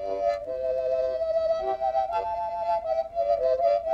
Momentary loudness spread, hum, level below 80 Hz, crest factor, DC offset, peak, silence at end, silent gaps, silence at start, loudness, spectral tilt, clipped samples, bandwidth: 5 LU; none; -54 dBFS; 14 dB; under 0.1%; -12 dBFS; 0 s; none; 0 s; -27 LUFS; -5.5 dB/octave; under 0.1%; 6.8 kHz